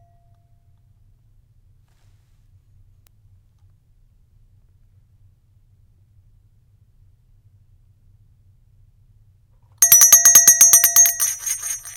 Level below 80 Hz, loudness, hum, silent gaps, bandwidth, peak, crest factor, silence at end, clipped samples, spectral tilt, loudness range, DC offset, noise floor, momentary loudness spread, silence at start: -56 dBFS; -10 LUFS; none; none; 18 kHz; 0 dBFS; 20 dB; 0.05 s; under 0.1%; 2.5 dB/octave; 6 LU; under 0.1%; -55 dBFS; 16 LU; 9.8 s